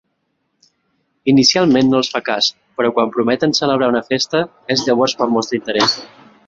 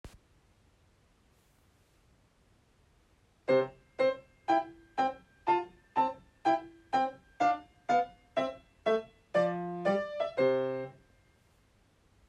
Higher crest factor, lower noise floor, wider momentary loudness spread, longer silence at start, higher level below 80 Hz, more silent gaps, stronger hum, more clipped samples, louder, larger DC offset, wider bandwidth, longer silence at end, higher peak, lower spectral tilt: about the same, 16 dB vs 18 dB; about the same, -69 dBFS vs -67 dBFS; about the same, 7 LU vs 8 LU; first, 1.25 s vs 0.05 s; first, -56 dBFS vs -68 dBFS; neither; neither; neither; first, -15 LUFS vs -32 LUFS; neither; second, 7.8 kHz vs 9.8 kHz; second, 0.4 s vs 1.4 s; first, 0 dBFS vs -16 dBFS; second, -4 dB/octave vs -6 dB/octave